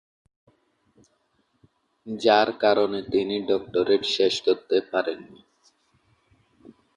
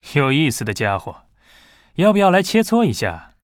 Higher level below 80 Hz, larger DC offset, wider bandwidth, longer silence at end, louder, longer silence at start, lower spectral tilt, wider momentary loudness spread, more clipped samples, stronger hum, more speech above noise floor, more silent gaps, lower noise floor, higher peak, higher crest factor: second, -66 dBFS vs -50 dBFS; neither; second, 10.5 kHz vs 17.5 kHz; first, 1.75 s vs 0.25 s; second, -23 LUFS vs -17 LUFS; first, 2.05 s vs 0.05 s; second, -4 dB/octave vs -5.5 dB/octave; second, 8 LU vs 11 LU; neither; neither; first, 47 dB vs 34 dB; neither; first, -69 dBFS vs -51 dBFS; about the same, -4 dBFS vs -2 dBFS; first, 22 dB vs 16 dB